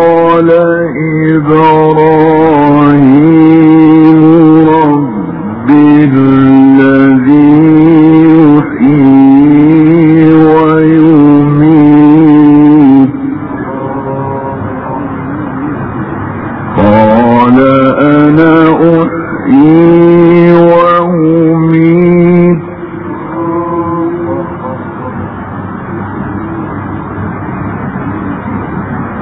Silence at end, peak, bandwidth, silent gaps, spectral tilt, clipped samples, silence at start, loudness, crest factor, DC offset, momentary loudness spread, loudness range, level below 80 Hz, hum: 0 s; 0 dBFS; 4.2 kHz; none; -11.5 dB/octave; 4%; 0 s; -5 LUFS; 6 dB; under 0.1%; 14 LU; 12 LU; -38 dBFS; none